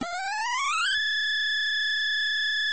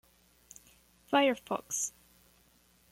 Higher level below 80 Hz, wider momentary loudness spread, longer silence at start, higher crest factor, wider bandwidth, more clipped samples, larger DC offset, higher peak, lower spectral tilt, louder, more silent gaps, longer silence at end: about the same, -68 dBFS vs -72 dBFS; second, 4 LU vs 26 LU; second, 0 s vs 1.1 s; second, 10 dB vs 20 dB; second, 8.8 kHz vs 16.5 kHz; neither; first, 0.5% vs under 0.1%; about the same, -18 dBFS vs -16 dBFS; second, 1 dB/octave vs -2 dB/octave; first, -25 LUFS vs -31 LUFS; neither; second, 0 s vs 1.05 s